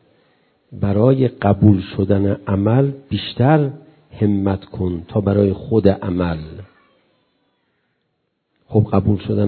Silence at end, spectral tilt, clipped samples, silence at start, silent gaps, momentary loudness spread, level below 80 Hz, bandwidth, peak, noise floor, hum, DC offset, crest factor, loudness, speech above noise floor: 0 s; -12.5 dB/octave; under 0.1%; 0.7 s; none; 10 LU; -38 dBFS; 4.5 kHz; 0 dBFS; -70 dBFS; none; under 0.1%; 18 dB; -18 LUFS; 54 dB